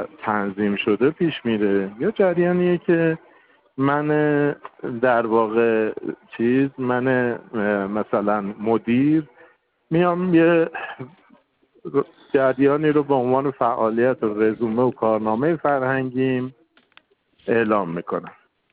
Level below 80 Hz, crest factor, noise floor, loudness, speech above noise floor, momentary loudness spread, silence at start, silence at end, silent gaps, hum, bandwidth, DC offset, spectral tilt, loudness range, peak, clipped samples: -62 dBFS; 16 dB; -59 dBFS; -21 LUFS; 39 dB; 8 LU; 0 s; 0.4 s; none; none; 4.5 kHz; under 0.1%; -12 dB/octave; 2 LU; -6 dBFS; under 0.1%